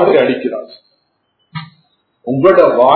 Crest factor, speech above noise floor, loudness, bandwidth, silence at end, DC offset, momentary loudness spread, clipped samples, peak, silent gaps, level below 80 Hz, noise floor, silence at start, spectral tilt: 14 dB; 54 dB; -12 LUFS; 6 kHz; 0 s; under 0.1%; 21 LU; 0.3%; 0 dBFS; none; -56 dBFS; -63 dBFS; 0 s; -9 dB/octave